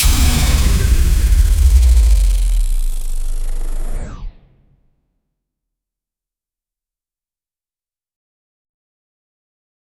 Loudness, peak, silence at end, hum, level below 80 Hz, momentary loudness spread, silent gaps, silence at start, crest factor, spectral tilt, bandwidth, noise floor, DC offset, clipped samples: -16 LUFS; 0 dBFS; 5.7 s; none; -16 dBFS; 15 LU; none; 0 s; 14 dB; -4.5 dB/octave; 20 kHz; under -90 dBFS; under 0.1%; under 0.1%